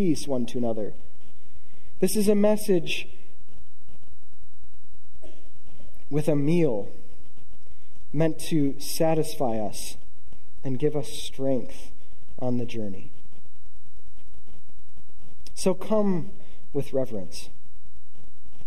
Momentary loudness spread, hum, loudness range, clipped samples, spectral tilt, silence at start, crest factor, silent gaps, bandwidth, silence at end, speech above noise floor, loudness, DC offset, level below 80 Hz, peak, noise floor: 18 LU; none; 9 LU; under 0.1%; -6 dB/octave; 0 s; 20 dB; none; 14.5 kHz; 0 s; 30 dB; -27 LUFS; 10%; -54 dBFS; -10 dBFS; -56 dBFS